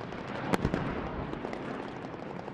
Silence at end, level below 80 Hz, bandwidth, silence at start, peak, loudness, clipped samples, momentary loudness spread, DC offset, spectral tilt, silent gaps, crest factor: 0 s; -48 dBFS; 12 kHz; 0 s; -6 dBFS; -35 LUFS; under 0.1%; 10 LU; under 0.1%; -6.5 dB/octave; none; 28 dB